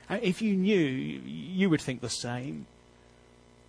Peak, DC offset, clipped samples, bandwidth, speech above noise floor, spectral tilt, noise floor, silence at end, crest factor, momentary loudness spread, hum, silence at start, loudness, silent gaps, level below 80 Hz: -12 dBFS; under 0.1%; under 0.1%; 11 kHz; 29 dB; -5.5 dB/octave; -58 dBFS; 1.05 s; 18 dB; 12 LU; 60 Hz at -55 dBFS; 0 s; -30 LUFS; none; -62 dBFS